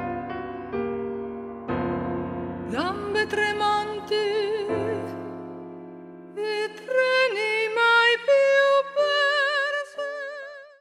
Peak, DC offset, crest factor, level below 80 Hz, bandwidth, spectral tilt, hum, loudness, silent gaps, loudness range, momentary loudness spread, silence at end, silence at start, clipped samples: -8 dBFS; under 0.1%; 18 dB; -58 dBFS; 11.5 kHz; -4 dB/octave; none; -24 LUFS; none; 8 LU; 17 LU; 0.15 s; 0 s; under 0.1%